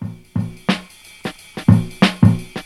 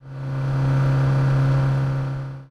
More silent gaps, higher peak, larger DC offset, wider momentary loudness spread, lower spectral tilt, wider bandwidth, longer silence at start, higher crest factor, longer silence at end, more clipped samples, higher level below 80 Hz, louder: neither; first, 0 dBFS vs -10 dBFS; neither; first, 17 LU vs 9 LU; second, -6.5 dB/octave vs -8.5 dB/octave; first, 13 kHz vs 6.6 kHz; about the same, 0 s vs 0.05 s; first, 18 dB vs 10 dB; about the same, 0.05 s vs 0.05 s; neither; about the same, -42 dBFS vs -40 dBFS; first, -18 LUFS vs -21 LUFS